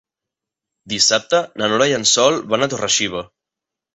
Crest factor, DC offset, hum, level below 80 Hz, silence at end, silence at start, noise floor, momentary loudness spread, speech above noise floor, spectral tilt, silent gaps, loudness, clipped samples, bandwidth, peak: 18 dB; under 0.1%; none; -58 dBFS; 0.7 s; 0.85 s; -85 dBFS; 8 LU; 68 dB; -2 dB/octave; none; -16 LUFS; under 0.1%; 8.4 kHz; -2 dBFS